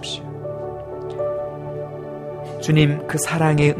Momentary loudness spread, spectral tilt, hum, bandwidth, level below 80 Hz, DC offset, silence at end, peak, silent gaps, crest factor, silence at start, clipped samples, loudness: 14 LU; -5.5 dB/octave; none; 15.5 kHz; -48 dBFS; under 0.1%; 0 s; -4 dBFS; none; 18 dB; 0 s; under 0.1%; -23 LUFS